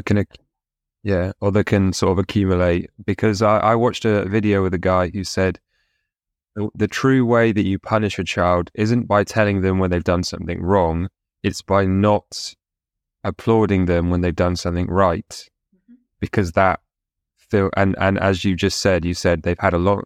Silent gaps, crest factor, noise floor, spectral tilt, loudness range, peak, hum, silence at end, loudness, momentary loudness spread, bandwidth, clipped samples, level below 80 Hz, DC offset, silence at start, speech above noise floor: none; 18 dB; -85 dBFS; -6.5 dB/octave; 3 LU; -2 dBFS; none; 0.05 s; -19 LUFS; 10 LU; 13 kHz; under 0.1%; -42 dBFS; under 0.1%; 0.05 s; 66 dB